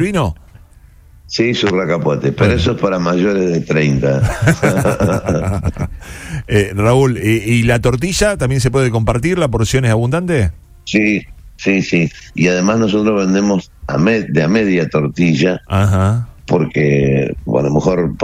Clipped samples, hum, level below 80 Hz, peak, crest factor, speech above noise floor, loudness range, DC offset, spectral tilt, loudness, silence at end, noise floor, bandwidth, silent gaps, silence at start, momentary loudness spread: under 0.1%; none; -32 dBFS; 0 dBFS; 14 dB; 29 dB; 2 LU; under 0.1%; -6 dB/octave; -15 LUFS; 0 s; -42 dBFS; 16 kHz; none; 0 s; 7 LU